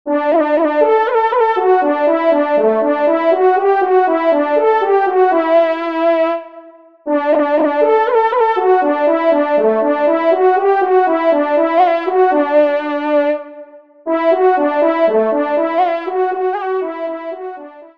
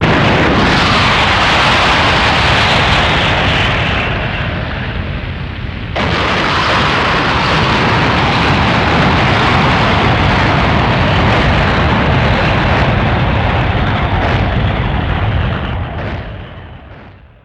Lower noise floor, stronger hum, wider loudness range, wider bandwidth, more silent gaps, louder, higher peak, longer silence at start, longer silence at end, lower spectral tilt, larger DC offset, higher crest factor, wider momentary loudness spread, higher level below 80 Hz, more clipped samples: about the same, -39 dBFS vs -36 dBFS; neither; second, 2 LU vs 6 LU; second, 5.6 kHz vs 11 kHz; neither; about the same, -14 LUFS vs -12 LUFS; about the same, 0 dBFS vs 0 dBFS; about the same, 0.05 s vs 0 s; second, 0.1 s vs 0.35 s; about the same, -6.5 dB/octave vs -5.5 dB/octave; first, 0.3% vs under 0.1%; about the same, 14 dB vs 12 dB; second, 7 LU vs 11 LU; second, -68 dBFS vs -22 dBFS; neither